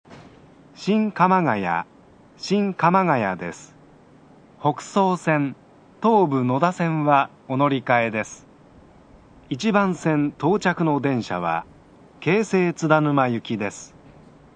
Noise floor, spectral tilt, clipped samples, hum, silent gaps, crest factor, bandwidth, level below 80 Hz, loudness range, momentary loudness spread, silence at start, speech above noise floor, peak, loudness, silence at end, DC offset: -50 dBFS; -6.5 dB/octave; under 0.1%; none; none; 22 dB; 9.8 kHz; -62 dBFS; 3 LU; 10 LU; 0.1 s; 30 dB; -2 dBFS; -21 LUFS; 0.7 s; under 0.1%